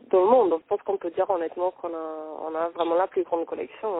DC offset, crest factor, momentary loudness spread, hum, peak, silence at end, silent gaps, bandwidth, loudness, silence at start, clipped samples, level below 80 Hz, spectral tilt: under 0.1%; 18 dB; 14 LU; none; -8 dBFS; 0 s; none; 4 kHz; -26 LUFS; 0.1 s; under 0.1%; -70 dBFS; -9.5 dB/octave